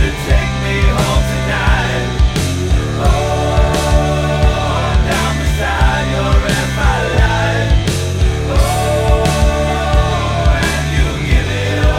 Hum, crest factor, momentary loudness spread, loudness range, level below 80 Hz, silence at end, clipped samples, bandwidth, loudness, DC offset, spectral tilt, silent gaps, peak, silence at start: none; 12 dB; 2 LU; 0 LU; -16 dBFS; 0 s; under 0.1%; 15.5 kHz; -14 LUFS; under 0.1%; -5 dB/octave; none; 0 dBFS; 0 s